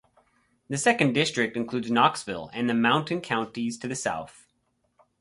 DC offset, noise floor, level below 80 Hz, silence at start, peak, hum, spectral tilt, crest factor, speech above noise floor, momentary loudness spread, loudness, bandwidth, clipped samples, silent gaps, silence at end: under 0.1%; -73 dBFS; -64 dBFS; 0.7 s; -6 dBFS; none; -4 dB/octave; 22 dB; 47 dB; 12 LU; -26 LUFS; 11.5 kHz; under 0.1%; none; 0.9 s